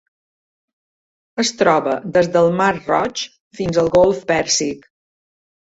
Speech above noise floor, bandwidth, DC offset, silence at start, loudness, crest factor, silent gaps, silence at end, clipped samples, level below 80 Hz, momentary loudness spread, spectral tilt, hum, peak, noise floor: over 73 dB; 8 kHz; under 0.1%; 1.35 s; -17 LUFS; 18 dB; 3.40-3.51 s; 1 s; under 0.1%; -50 dBFS; 12 LU; -4 dB/octave; none; -2 dBFS; under -90 dBFS